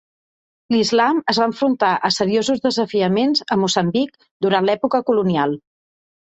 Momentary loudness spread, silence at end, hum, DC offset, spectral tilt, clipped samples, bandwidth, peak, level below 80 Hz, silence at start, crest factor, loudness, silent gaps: 5 LU; 0.8 s; none; under 0.1%; -5 dB/octave; under 0.1%; 8.4 kHz; -2 dBFS; -60 dBFS; 0.7 s; 16 dB; -18 LUFS; 4.31-4.40 s